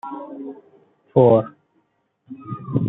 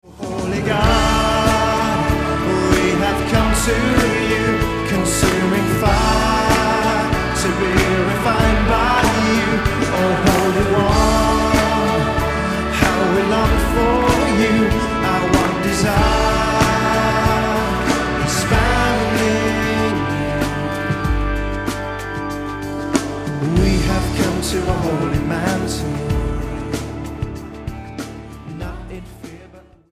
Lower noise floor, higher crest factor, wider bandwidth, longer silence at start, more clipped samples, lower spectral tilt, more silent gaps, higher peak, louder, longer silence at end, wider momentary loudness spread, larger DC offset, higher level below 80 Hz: first, -67 dBFS vs -43 dBFS; about the same, 20 dB vs 16 dB; second, 4 kHz vs 15.5 kHz; about the same, 0.05 s vs 0.05 s; neither; first, -12.5 dB/octave vs -5 dB/octave; neither; about the same, -2 dBFS vs 0 dBFS; about the same, -17 LUFS vs -17 LUFS; second, 0 s vs 0.3 s; first, 23 LU vs 10 LU; neither; second, -62 dBFS vs -26 dBFS